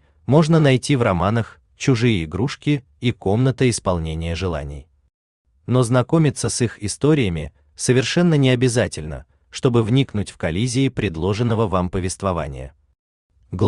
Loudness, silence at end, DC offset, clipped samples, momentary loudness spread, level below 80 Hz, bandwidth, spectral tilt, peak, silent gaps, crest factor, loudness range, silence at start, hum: -19 LUFS; 0 s; under 0.1%; under 0.1%; 14 LU; -42 dBFS; 11 kHz; -6 dB/octave; -2 dBFS; 5.14-5.45 s, 12.99-13.30 s; 16 dB; 4 LU; 0.3 s; none